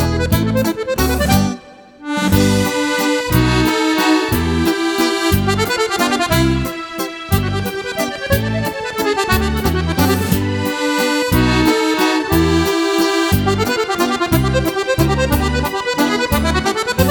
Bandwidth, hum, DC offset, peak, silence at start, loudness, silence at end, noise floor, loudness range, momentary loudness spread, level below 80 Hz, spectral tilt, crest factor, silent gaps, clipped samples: 19.5 kHz; none; under 0.1%; 0 dBFS; 0 s; -16 LUFS; 0 s; -38 dBFS; 3 LU; 6 LU; -28 dBFS; -5 dB/octave; 16 dB; none; under 0.1%